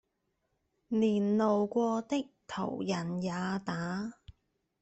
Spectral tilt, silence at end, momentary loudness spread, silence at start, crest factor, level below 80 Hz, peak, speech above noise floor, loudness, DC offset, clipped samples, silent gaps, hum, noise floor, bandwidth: -6.5 dB/octave; 0.5 s; 9 LU; 0.9 s; 16 dB; -68 dBFS; -18 dBFS; 49 dB; -32 LUFS; under 0.1%; under 0.1%; none; none; -80 dBFS; 8.2 kHz